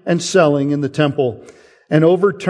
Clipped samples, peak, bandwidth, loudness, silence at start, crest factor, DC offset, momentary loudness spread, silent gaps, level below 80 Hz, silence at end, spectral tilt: under 0.1%; 0 dBFS; 10.5 kHz; -15 LUFS; 0.05 s; 16 dB; under 0.1%; 7 LU; none; -62 dBFS; 0 s; -6 dB/octave